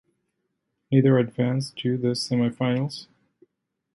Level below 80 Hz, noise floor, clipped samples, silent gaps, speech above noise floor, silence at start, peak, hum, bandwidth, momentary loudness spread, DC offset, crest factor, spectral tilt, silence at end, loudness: -66 dBFS; -77 dBFS; under 0.1%; none; 55 dB; 0.9 s; -6 dBFS; none; 11.5 kHz; 8 LU; under 0.1%; 18 dB; -7 dB/octave; 0.9 s; -24 LUFS